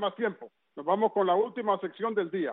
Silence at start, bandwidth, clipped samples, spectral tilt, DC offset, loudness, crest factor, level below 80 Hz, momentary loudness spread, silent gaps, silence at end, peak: 0 s; 4 kHz; under 0.1%; -3.5 dB/octave; under 0.1%; -29 LUFS; 16 dB; -78 dBFS; 11 LU; none; 0 s; -12 dBFS